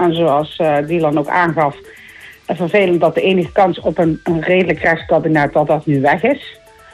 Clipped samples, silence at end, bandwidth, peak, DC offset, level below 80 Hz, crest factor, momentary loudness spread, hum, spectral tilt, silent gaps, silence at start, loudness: under 0.1%; 0.4 s; 13 kHz; -2 dBFS; under 0.1%; -46 dBFS; 12 dB; 6 LU; none; -7.5 dB/octave; none; 0 s; -15 LUFS